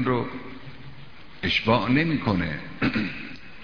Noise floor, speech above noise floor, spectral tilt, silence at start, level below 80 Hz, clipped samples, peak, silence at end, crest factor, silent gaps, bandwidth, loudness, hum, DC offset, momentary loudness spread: -46 dBFS; 22 dB; -7 dB/octave; 0 s; -48 dBFS; under 0.1%; -6 dBFS; 0 s; 20 dB; none; 5.4 kHz; -25 LUFS; none; 0.9%; 21 LU